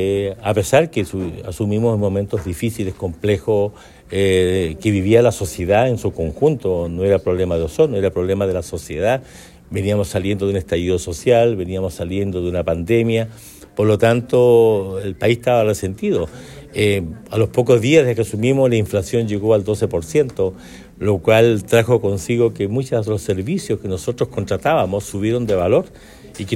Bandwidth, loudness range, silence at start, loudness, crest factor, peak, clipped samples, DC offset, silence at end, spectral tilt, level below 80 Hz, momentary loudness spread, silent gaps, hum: 15.5 kHz; 3 LU; 0 s; -18 LUFS; 16 dB; 0 dBFS; under 0.1%; under 0.1%; 0 s; -6.5 dB/octave; -42 dBFS; 10 LU; none; none